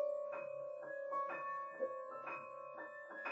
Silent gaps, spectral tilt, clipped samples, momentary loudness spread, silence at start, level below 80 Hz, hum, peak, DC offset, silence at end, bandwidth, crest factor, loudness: none; -5.5 dB/octave; under 0.1%; 8 LU; 0 s; under -90 dBFS; none; -30 dBFS; under 0.1%; 0 s; 8 kHz; 16 dB; -45 LUFS